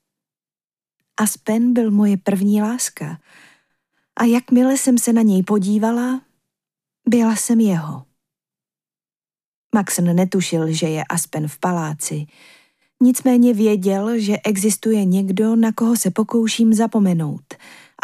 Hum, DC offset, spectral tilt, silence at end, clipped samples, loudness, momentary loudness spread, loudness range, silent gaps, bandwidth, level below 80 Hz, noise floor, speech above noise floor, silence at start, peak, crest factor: none; under 0.1%; -5.5 dB/octave; 0.5 s; under 0.1%; -17 LUFS; 10 LU; 4 LU; 9.44-9.70 s; 15.5 kHz; -70 dBFS; under -90 dBFS; over 73 dB; 1.2 s; -4 dBFS; 16 dB